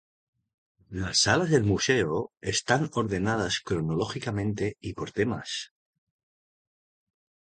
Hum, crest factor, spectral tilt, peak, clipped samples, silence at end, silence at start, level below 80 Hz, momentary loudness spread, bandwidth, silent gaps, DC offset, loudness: none; 22 dB; -4 dB/octave; -6 dBFS; under 0.1%; 1.75 s; 0.9 s; -52 dBFS; 12 LU; 9.4 kHz; none; under 0.1%; -27 LUFS